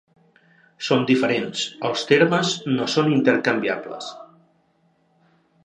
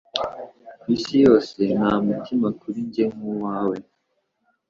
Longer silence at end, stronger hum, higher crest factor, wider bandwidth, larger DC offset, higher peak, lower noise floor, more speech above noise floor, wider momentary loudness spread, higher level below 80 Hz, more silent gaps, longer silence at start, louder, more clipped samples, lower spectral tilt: first, 1.4 s vs 0.9 s; neither; about the same, 22 dB vs 20 dB; first, 10.5 kHz vs 7.6 kHz; neither; about the same, -2 dBFS vs -2 dBFS; second, -63 dBFS vs -72 dBFS; second, 43 dB vs 52 dB; second, 13 LU vs 16 LU; second, -70 dBFS vs -56 dBFS; neither; first, 0.8 s vs 0.15 s; about the same, -20 LUFS vs -22 LUFS; neither; second, -5 dB/octave vs -7 dB/octave